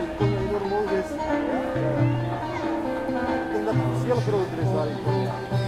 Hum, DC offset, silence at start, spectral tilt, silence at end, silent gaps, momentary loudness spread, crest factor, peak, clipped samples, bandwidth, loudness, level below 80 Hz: none; under 0.1%; 0 s; -7.5 dB/octave; 0 s; none; 4 LU; 14 dB; -10 dBFS; under 0.1%; 12.5 kHz; -25 LUFS; -46 dBFS